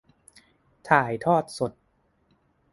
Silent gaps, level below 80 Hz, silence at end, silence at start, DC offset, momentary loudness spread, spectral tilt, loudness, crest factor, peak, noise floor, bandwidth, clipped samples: none; -64 dBFS; 1.05 s; 0.85 s; under 0.1%; 10 LU; -6 dB/octave; -24 LUFS; 26 dB; -2 dBFS; -68 dBFS; 11.5 kHz; under 0.1%